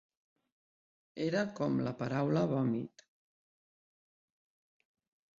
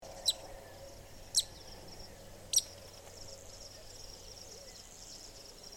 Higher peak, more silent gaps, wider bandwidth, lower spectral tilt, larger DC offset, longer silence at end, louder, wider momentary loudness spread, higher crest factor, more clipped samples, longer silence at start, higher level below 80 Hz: second, -20 dBFS vs -16 dBFS; neither; second, 7.6 kHz vs 17 kHz; first, -7 dB/octave vs 0 dB/octave; neither; first, 2.55 s vs 0 s; about the same, -34 LUFS vs -35 LUFS; second, 8 LU vs 20 LU; second, 18 dB vs 26 dB; neither; first, 1.15 s vs 0 s; second, -74 dBFS vs -58 dBFS